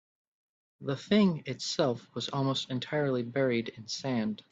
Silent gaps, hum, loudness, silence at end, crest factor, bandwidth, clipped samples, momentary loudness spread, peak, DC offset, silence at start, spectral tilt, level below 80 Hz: none; none; -31 LUFS; 0.15 s; 18 dB; 8 kHz; under 0.1%; 11 LU; -12 dBFS; under 0.1%; 0.8 s; -5.5 dB/octave; -70 dBFS